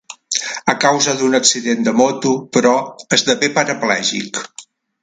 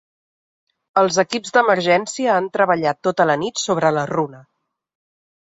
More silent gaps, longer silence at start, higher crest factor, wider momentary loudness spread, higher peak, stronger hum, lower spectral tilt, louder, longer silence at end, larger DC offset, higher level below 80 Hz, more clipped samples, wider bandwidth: neither; second, 0.1 s vs 0.95 s; about the same, 16 dB vs 18 dB; about the same, 8 LU vs 6 LU; about the same, 0 dBFS vs -2 dBFS; neither; second, -2.5 dB/octave vs -4 dB/octave; first, -15 LUFS vs -18 LUFS; second, 0.4 s vs 1.1 s; neither; about the same, -62 dBFS vs -62 dBFS; neither; first, 9.6 kHz vs 8 kHz